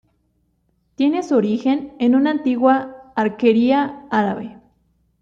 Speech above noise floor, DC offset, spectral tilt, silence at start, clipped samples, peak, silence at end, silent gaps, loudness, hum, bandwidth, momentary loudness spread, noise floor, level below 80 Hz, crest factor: 48 dB; under 0.1%; -7 dB/octave; 1 s; under 0.1%; -2 dBFS; 0.7 s; none; -18 LUFS; none; 7.4 kHz; 7 LU; -65 dBFS; -60 dBFS; 16 dB